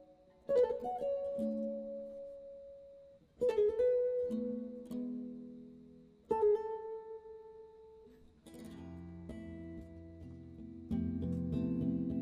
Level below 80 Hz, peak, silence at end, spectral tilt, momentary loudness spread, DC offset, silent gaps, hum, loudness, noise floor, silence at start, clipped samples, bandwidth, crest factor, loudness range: -60 dBFS; -22 dBFS; 0 s; -9 dB/octave; 22 LU; under 0.1%; none; none; -37 LUFS; -60 dBFS; 0 s; under 0.1%; 11 kHz; 18 dB; 14 LU